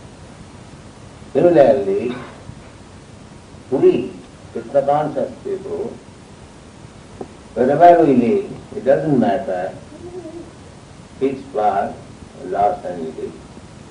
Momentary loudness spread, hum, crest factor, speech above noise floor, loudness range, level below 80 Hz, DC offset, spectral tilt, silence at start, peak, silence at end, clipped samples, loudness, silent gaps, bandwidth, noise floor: 27 LU; none; 20 dB; 24 dB; 7 LU; -50 dBFS; under 0.1%; -7.5 dB/octave; 0 s; 0 dBFS; 0 s; under 0.1%; -17 LUFS; none; 10 kHz; -40 dBFS